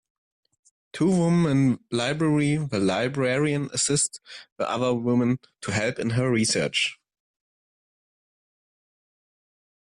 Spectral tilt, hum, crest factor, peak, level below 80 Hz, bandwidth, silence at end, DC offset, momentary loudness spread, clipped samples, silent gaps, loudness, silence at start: -4.5 dB/octave; none; 14 dB; -12 dBFS; -60 dBFS; 11 kHz; 3.05 s; under 0.1%; 8 LU; under 0.1%; 4.52-4.56 s; -24 LUFS; 0.95 s